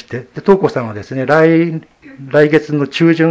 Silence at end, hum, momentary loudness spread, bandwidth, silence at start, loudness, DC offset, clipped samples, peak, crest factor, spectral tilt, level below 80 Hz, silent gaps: 0 s; none; 12 LU; 8 kHz; 0.1 s; -13 LUFS; under 0.1%; 0.2%; 0 dBFS; 14 dB; -7.5 dB/octave; -52 dBFS; none